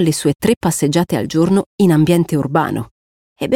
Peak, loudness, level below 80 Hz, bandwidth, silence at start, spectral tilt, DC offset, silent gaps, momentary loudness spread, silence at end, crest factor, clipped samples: -2 dBFS; -16 LUFS; -48 dBFS; 17 kHz; 0 s; -6 dB/octave; under 0.1%; 0.57-0.61 s, 1.66-1.78 s, 2.91-3.36 s; 9 LU; 0 s; 14 dB; under 0.1%